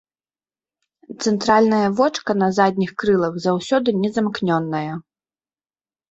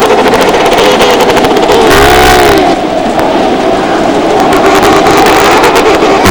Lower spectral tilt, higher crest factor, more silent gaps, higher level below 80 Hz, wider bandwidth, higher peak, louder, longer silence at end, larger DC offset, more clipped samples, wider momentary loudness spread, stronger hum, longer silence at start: first, -6 dB/octave vs -4 dB/octave; first, 18 dB vs 6 dB; neither; second, -58 dBFS vs -24 dBFS; second, 8 kHz vs over 20 kHz; about the same, -2 dBFS vs 0 dBFS; second, -19 LUFS vs -5 LUFS; first, 1.1 s vs 0 s; neither; second, under 0.1% vs 6%; first, 9 LU vs 5 LU; neither; first, 1.1 s vs 0 s